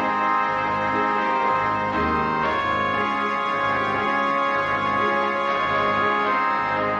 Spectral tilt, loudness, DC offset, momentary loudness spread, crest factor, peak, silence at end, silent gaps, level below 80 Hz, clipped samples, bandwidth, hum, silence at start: -5.5 dB/octave; -21 LUFS; under 0.1%; 2 LU; 12 dB; -10 dBFS; 0 s; none; -50 dBFS; under 0.1%; 9.4 kHz; none; 0 s